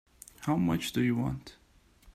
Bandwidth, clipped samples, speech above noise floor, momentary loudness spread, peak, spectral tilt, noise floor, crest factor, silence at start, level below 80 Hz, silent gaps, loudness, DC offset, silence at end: 15.5 kHz; under 0.1%; 30 dB; 13 LU; -18 dBFS; -6 dB/octave; -60 dBFS; 14 dB; 0.4 s; -56 dBFS; none; -31 LUFS; under 0.1%; 0.05 s